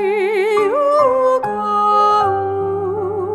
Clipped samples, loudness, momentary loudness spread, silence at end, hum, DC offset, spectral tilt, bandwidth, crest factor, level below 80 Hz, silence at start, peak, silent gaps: under 0.1%; -16 LUFS; 7 LU; 0 s; none; under 0.1%; -6 dB/octave; 12.5 kHz; 12 dB; -54 dBFS; 0 s; -2 dBFS; none